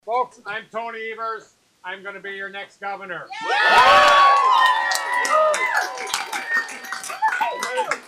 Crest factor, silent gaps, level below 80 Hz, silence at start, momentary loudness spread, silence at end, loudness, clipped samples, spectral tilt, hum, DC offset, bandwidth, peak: 14 dB; none; -60 dBFS; 0.05 s; 19 LU; 0.05 s; -18 LUFS; under 0.1%; -0.5 dB/octave; none; under 0.1%; 15.5 kHz; -6 dBFS